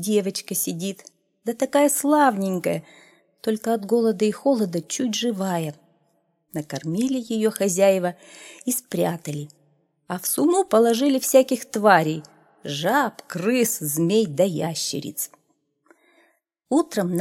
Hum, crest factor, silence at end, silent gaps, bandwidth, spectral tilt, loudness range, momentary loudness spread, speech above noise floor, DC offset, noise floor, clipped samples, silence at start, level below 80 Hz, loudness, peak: none; 22 dB; 0 s; none; 17 kHz; -4.5 dB/octave; 5 LU; 14 LU; 47 dB; under 0.1%; -68 dBFS; under 0.1%; 0 s; -72 dBFS; -22 LUFS; -2 dBFS